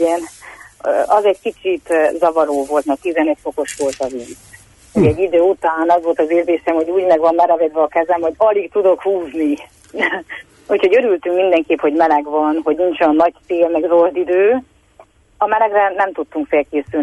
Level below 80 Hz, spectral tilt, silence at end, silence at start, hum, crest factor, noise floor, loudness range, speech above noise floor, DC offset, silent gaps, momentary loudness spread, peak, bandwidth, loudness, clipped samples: -50 dBFS; -6 dB/octave; 0 s; 0 s; none; 12 dB; -48 dBFS; 3 LU; 33 dB; under 0.1%; none; 8 LU; -2 dBFS; 11.5 kHz; -16 LUFS; under 0.1%